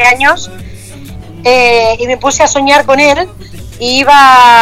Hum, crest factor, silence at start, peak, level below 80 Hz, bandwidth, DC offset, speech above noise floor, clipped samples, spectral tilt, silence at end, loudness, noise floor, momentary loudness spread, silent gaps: none; 8 dB; 0 s; 0 dBFS; -34 dBFS; 17 kHz; under 0.1%; 20 dB; 0.7%; -2.5 dB/octave; 0 s; -7 LUFS; -27 dBFS; 13 LU; none